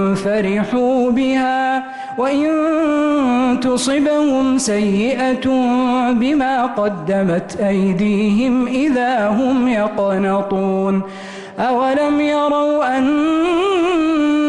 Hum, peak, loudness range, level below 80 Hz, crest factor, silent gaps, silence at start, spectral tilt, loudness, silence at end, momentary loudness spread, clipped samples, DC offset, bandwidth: none; -8 dBFS; 2 LU; -48 dBFS; 8 dB; none; 0 s; -5.5 dB/octave; -16 LUFS; 0 s; 3 LU; under 0.1%; under 0.1%; 11.5 kHz